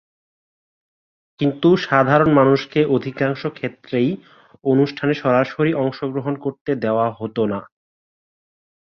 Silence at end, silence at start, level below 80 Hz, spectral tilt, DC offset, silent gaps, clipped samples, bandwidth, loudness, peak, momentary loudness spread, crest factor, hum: 1.2 s; 1.4 s; -58 dBFS; -8 dB/octave; under 0.1%; 6.61-6.65 s; under 0.1%; 6.6 kHz; -19 LUFS; 0 dBFS; 11 LU; 18 dB; none